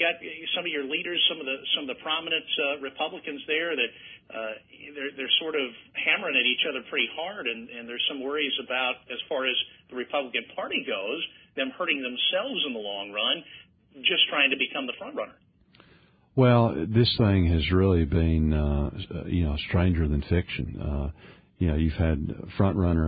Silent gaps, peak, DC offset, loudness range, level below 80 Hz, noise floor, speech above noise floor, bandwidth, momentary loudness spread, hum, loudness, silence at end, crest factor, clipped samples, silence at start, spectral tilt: none; -8 dBFS; under 0.1%; 5 LU; -36 dBFS; -59 dBFS; 32 dB; 5 kHz; 12 LU; none; -26 LUFS; 0 s; 18 dB; under 0.1%; 0 s; -10 dB/octave